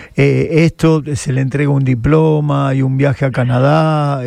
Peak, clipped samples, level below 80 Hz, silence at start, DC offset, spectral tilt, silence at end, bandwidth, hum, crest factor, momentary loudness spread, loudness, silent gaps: 0 dBFS; under 0.1%; -38 dBFS; 0 s; under 0.1%; -7.5 dB/octave; 0 s; 10.5 kHz; none; 12 dB; 4 LU; -13 LUFS; none